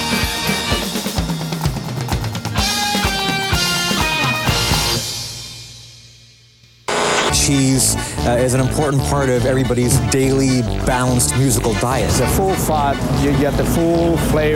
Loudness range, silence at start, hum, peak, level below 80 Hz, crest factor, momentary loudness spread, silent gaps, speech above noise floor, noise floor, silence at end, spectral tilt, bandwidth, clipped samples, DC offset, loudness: 3 LU; 0 s; none; -2 dBFS; -28 dBFS; 14 dB; 7 LU; none; 33 dB; -48 dBFS; 0 s; -4 dB/octave; 18.5 kHz; under 0.1%; under 0.1%; -16 LUFS